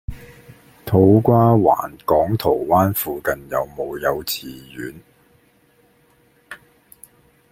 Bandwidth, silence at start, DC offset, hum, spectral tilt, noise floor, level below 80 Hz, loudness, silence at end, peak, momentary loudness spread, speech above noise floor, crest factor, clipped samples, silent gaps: 16.5 kHz; 0.1 s; under 0.1%; none; -7 dB/octave; -57 dBFS; -46 dBFS; -18 LUFS; 0.95 s; -2 dBFS; 23 LU; 39 dB; 18 dB; under 0.1%; none